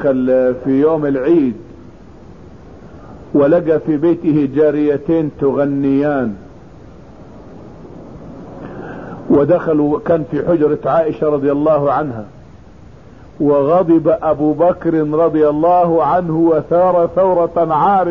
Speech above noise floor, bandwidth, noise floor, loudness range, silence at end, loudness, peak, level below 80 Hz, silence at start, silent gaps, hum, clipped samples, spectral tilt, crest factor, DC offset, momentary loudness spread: 26 dB; 5.6 kHz; -39 dBFS; 7 LU; 0 s; -14 LUFS; -2 dBFS; -44 dBFS; 0 s; none; none; under 0.1%; -10 dB/octave; 12 dB; 0.5%; 17 LU